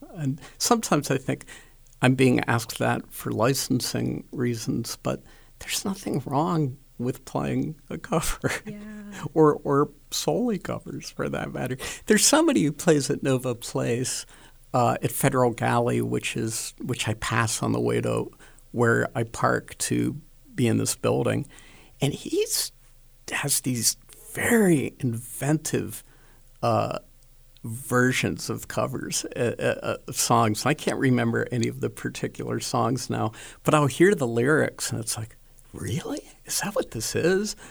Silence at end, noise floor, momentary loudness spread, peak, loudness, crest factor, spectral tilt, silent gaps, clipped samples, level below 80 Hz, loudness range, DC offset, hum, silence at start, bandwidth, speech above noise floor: 0 s; -52 dBFS; 11 LU; -4 dBFS; -25 LUFS; 22 dB; -4.5 dB/octave; none; under 0.1%; -50 dBFS; 4 LU; under 0.1%; none; 0 s; over 20 kHz; 28 dB